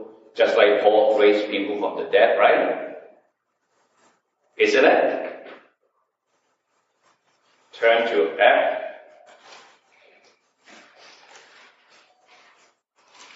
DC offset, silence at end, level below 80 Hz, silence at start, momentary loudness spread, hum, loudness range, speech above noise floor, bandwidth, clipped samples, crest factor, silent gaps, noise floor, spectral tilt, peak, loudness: under 0.1%; 4.4 s; -86 dBFS; 0 s; 17 LU; none; 7 LU; 54 dB; 8 kHz; under 0.1%; 20 dB; none; -72 dBFS; 0 dB/octave; -2 dBFS; -19 LUFS